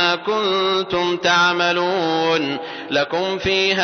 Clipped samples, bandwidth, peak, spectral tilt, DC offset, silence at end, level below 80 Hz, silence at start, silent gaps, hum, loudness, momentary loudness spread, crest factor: under 0.1%; 6.6 kHz; -4 dBFS; -3.5 dB/octave; under 0.1%; 0 s; -52 dBFS; 0 s; none; none; -18 LUFS; 6 LU; 14 dB